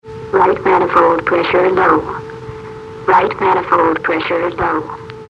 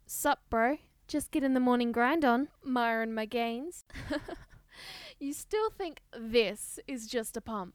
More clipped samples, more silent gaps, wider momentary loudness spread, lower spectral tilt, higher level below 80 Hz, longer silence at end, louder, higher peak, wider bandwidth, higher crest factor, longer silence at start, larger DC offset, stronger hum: neither; neither; about the same, 17 LU vs 17 LU; first, -7 dB/octave vs -3.5 dB/octave; first, -44 dBFS vs -58 dBFS; about the same, 0.05 s vs 0.05 s; first, -14 LUFS vs -32 LUFS; first, 0 dBFS vs -12 dBFS; second, 8.2 kHz vs 19.5 kHz; second, 14 dB vs 20 dB; about the same, 0.05 s vs 0.1 s; neither; neither